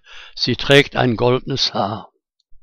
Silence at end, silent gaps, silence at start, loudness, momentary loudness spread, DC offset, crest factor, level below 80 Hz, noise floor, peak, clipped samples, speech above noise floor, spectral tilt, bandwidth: 0.05 s; none; 0.1 s; -17 LUFS; 12 LU; under 0.1%; 18 dB; -40 dBFS; -46 dBFS; 0 dBFS; under 0.1%; 29 dB; -5 dB/octave; 15.5 kHz